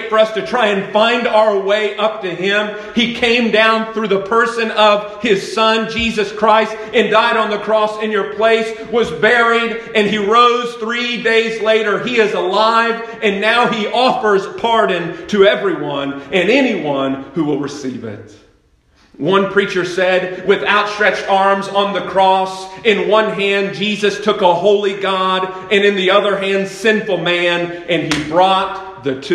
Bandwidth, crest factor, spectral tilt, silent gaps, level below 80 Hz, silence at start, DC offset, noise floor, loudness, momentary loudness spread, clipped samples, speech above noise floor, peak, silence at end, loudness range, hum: 11.5 kHz; 14 dB; -4.5 dB/octave; none; -52 dBFS; 0 s; under 0.1%; -53 dBFS; -14 LUFS; 7 LU; under 0.1%; 39 dB; 0 dBFS; 0 s; 3 LU; none